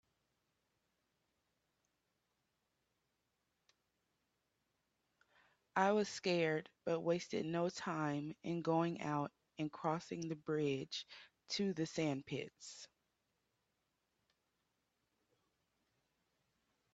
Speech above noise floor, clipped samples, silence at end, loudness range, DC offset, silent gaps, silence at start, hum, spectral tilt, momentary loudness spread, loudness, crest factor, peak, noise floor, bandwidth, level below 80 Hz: 46 dB; under 0.1%; 4.1 s; 7 LU; under 0.1%; none; 5.75 s; none; -5.5 dB/octave; 11 LU; -40 LUFS; 24 dB; -20 dBFS; -86 dBFS; 8.2 kHz; -84 dBFS